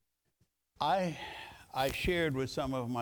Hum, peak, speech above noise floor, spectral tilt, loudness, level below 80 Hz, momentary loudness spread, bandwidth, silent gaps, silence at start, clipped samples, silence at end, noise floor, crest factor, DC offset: none; -18 dBFS; 44 dB; -5 dB/octave; -34 LUFS; -54 dBFS; 11 LU; over 20 kHz; none; 0.8 s; under 0.1%; 0 s; -77 dBFS; 18 dB; under 0.1%